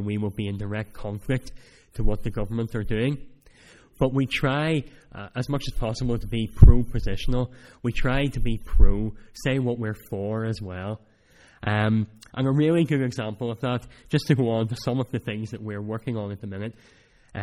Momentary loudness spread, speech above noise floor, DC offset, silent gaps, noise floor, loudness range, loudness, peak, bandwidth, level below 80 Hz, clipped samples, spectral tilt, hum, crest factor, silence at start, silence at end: 11 LU; 33 dB; under 0.1%; none; -56 dBFS; 5 LU; -26 LUFS; 0 dBFS; 12 kHz; -28 dBFS; under 0.1%; -7.5 dB/octave; none; 24 dB; 0 s; 0 s